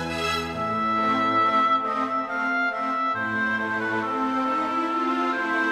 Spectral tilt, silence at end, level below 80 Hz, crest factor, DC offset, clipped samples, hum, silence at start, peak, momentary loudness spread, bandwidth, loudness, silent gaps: -4.5 dB/octave; 0 s; -56 dBFS; 12 dB; under 0.1%; under 0.1%; none; 0 s; -12 dBFS; 5 LU; 14 kHz; -24 LUFS; none